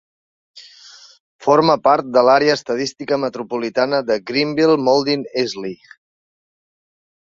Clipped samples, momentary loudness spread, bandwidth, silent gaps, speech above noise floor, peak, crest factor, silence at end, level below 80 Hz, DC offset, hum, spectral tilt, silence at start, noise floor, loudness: under 0.1%; 10 LU; 7.8 kHz; 1.20-1.39 s; 27 dB; 0 dBFS; 18 dB; 1.55 s; -62 dBFS; under 0.1%; none; -5 dB/octave; 0.55 s; -44 dBFS; -17 LUFS